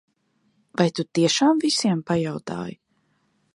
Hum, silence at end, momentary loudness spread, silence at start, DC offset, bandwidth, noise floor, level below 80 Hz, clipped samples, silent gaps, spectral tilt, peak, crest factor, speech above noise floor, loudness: none; 0.85 s; 14 LU; 0.8 s; under 0.1%; 11.5 kHz; -68 dBFS; -64 dBFS; under 0.1%; none; -4.5 dB/octave; -4 dBFS; 20 dB; 46 dB; -22 LUFS